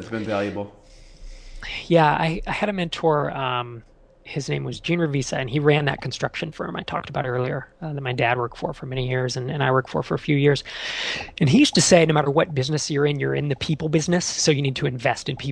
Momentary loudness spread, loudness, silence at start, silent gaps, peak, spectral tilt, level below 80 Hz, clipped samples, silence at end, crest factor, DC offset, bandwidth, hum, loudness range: 12 LU; -22 LUFS; 0 s; none; -2 dBFS; -5 dB/octave; -46 dBFS; under 0.1%; 0 s; 20 dB; under 0.1%; 11 kHz; none; 6 LU